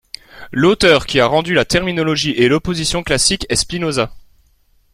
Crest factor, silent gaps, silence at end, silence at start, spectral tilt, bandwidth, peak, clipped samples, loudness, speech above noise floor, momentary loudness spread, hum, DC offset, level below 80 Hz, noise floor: 16 dB; none; 0.75 s; 0.35 s; -3.5 dB/octave; 15 kHz; 0 dBFS; under 0.1%; -15 LUFS; 40 dB; 9 LU; none; under 0.1%; -36 dBFS; -55 dBFS